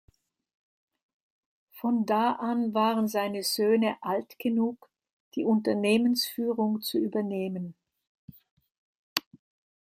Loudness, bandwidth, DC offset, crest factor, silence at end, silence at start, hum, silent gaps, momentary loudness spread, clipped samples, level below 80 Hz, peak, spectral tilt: -28 LUFS; 16 kHz; under 0.1%; 26 dB; 0.6 s; 1.75 s; none; 5.13-5.31 s, 8.07-8.28 s, 8.51-8.57 s, 8.78-9.16 s; 9 LU; under 0.1%; -76 dBFS; -2 dBFS; -5 dB/octave